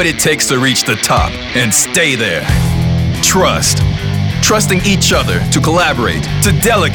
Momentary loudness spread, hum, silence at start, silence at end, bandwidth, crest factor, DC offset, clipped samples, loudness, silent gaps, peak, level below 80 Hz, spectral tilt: 4 LU; none; 0 s; 0 s; over 20 kHz; 10 dB; under 0.1%; under 0.1%; -11 LUFS; none; 0 dBFS; -26 dBFS; -3.5 dB/octave